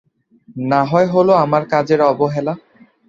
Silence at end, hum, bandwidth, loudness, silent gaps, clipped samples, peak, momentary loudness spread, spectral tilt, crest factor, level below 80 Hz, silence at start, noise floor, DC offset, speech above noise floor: 0.5 s; none; 7.6 kHz; -15 LUFS; none; under 0.1%; -2 dBFS; 13 LU; -8 dB/octave; 16 dB; -58 dBFS; 0.55 s; -48 dBFS; under 0.1%; 34 dB